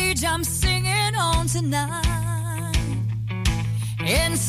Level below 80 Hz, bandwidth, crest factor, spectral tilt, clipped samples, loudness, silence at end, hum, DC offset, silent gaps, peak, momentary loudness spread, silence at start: -30 dBFS; 16 kHz; 12 dB; -4 dB/octave; under 0.1%; -23 LUFS; 0 s; none; under 0.1%; none; -10 dBFS; 6 LU; 0 s